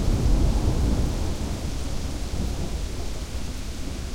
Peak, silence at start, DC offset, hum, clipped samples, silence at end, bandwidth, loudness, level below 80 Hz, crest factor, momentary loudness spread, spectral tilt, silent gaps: -10 dBFS; 0 s; under 0.1%; none; under 0.1%; 0 s; 16 kHz; -28 LUFS; -26 dBFS; 14 dB; 10 LU; -6 dB/octave; none